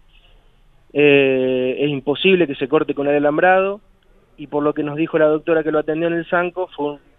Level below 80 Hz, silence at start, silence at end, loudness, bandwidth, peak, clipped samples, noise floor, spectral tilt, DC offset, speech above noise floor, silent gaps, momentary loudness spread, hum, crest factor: -54 dBFS; 0.95 s; 0.2 s; -18 LUFS; 4 kHz; -2 dBFS; under 0.1%; -53 dBFS; -9 dB/octave; under 0.1%; 35 dB; none; 10 LU; none; 18 dB